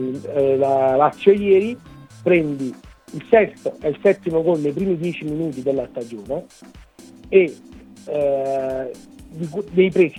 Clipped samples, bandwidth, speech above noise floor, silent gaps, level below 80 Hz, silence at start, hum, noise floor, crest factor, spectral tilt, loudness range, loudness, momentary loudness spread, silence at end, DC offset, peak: under 0.1%; 11 kHz; 24 dB; none; -52 dBFS; 0 s; none; -43 dBFS; 20 dB; -7.5 dB/octave; 5 LU; -20 LUFS; 15 LU; 0 s; under 0.1%; 0 dBFS